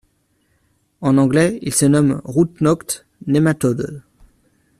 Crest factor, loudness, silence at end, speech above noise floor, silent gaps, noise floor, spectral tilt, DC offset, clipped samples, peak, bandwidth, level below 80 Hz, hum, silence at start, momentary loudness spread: 16 dB; -17 LUFS; 0.8 s; 47 dB; none; -63 dBFS; -6 dB/octave; under 0.1%; under 0.1%; -2 dBFS; 13.5 kHz; -50 dBFS; none; 1 s; 12 LU